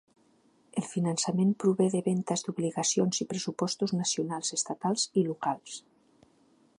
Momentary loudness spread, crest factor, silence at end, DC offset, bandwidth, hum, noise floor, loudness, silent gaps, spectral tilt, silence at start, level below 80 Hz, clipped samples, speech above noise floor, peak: 8 LU; 18 dB; 1 s; under 0.1%; 11 kHz; none; -65 dBFS; -29 LUFS; none; -4.5 dB/octave; 0.75 s; -76 dBFS; under 0.1%; 36 dB; -12 dBFS